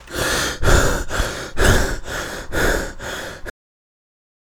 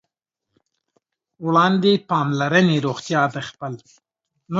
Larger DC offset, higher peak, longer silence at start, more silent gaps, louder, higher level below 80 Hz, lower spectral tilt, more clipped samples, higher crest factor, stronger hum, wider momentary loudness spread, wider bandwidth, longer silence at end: neither; about the same, 0 dBFS vs -2 dBFS; second, 0 s vs 1.4 s; neither; about the same, -20 LUFS vs -19 LUFS; first, -24 dBFS vs -66 dBFS; second, -3.5 dB/octave vs -6 dB/octave; neither; about the same, 20 dB vs 20 dB; neither; second, 12 LU vs 15 LU; first, over 20 kHz vs 7.8 kHz; first, 1 s vs 0 s